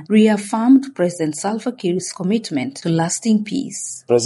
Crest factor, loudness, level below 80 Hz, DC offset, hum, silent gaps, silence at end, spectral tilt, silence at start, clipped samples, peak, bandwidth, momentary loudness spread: 14 dB; -19 LUFS; -66 dBFS; under 0.1%; none; none; 0 s; -5 dB/octave; 0 s; under 0.1%; -4 dBFS; 11.5 kHz; 10 LU